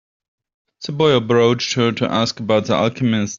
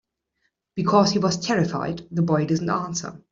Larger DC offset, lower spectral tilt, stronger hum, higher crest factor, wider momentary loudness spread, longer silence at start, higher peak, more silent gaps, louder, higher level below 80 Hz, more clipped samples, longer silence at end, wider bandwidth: neither; about the same, -5.5 dB/octave vs -5.5 dB/octave; neither; about the same, 16 dB vs 20 dB; second, 5 LU vs 11 LU; about the same, 0.8 s vs 0.75 s; about the same, -2 dBFS vs -4 dBFS; neither; first, -17 LUFS vs -23 LUFS; about the same, -56 dBFS vs -58 dBFS; neither; second, 0 s vs 0.15 s; about the same, 7.6 kHz vs 7.6 kHz